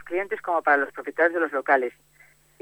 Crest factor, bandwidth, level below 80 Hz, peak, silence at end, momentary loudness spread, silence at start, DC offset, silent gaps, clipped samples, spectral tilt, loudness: 18 dB; 20 kHz; -70 dBFS; -8 dBFS; 0.7 s; 8 LU; 0 s; under 0.1%; none; under 0.1%; -5 dB/octave; -24 LUFS